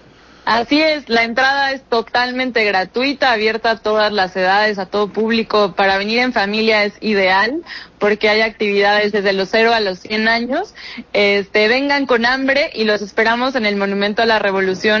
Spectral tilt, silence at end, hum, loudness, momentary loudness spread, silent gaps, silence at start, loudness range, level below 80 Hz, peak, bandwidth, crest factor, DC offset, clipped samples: -4.5 dB/octave; 0 s; none; -15 LUFS; 5 LU; none; 0.45 s; 1 LU; -50 dBFS; -4 dBFS; 7.2 kHz; 12 dB; under 0.1%; under 0.1%